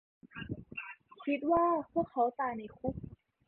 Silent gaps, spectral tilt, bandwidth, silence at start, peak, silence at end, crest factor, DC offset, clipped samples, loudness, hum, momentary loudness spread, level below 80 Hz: none; -10 dB/octave; 4.2 kHz; 0.25 s; -18 dBFS; 0.35 s; 18 dB; under 0.1%; under 0.1%; -34 LUFS; none; 18 LU; -60 dBFS